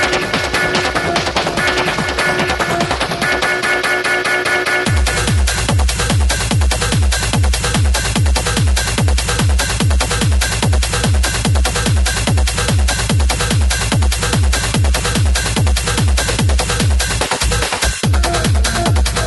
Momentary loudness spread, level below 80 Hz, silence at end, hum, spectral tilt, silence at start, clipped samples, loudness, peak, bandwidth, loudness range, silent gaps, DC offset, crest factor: 1 LU; -18 dBFS; 0 s; none; -3.5 dB/octave; 0 s; under 0.1%; -15 LUFS; 0 dBFS; 12 kHz; 0 LU; none; under 0.1%; 14 dB